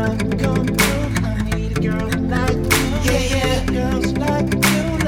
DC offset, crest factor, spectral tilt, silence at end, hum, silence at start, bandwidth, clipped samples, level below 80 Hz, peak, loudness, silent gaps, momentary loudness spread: under 0.1%; 16 dB; -5 dB/octave; 0 s; none; 0 s; 17.5 kHz; under 0.1%; -28 dBFS; -2 dBFS; -19 LUFS; none; 4 LU